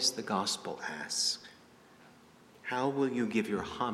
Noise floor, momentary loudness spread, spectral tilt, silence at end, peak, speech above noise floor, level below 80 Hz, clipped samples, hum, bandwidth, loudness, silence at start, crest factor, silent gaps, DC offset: -59 dBFS; 9 LU; -3 dB/octave; 0 s; -14 dBFS; 26 dB; -68 dBFS; under 0.1%; none; 15.5 kHz; -33 LUFS; 0 s; 20 dB; none; under 0.1%